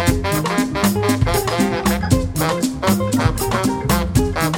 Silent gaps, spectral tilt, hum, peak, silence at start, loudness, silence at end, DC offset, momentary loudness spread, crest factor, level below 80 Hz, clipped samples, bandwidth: none; -5 dB/octave; none; -2 dBFS; 0 s; -18 LUFS; 0 s; under 0.1%; 2 LU; 16 dB; -28 dBFS; under 0.1%; 17 kHz